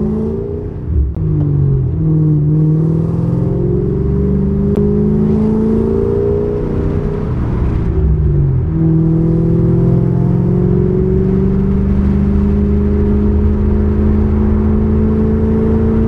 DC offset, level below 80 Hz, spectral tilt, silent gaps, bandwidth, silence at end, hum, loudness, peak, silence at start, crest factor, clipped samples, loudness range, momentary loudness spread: under 0.1%; -20 dBFS; -12 dB/octave; none; 3.7 kHz; 0 s; none; -14 LUFS; -2 dBFS; 0 s; 10 dB; under 0.1%; 2 LU; 4 LU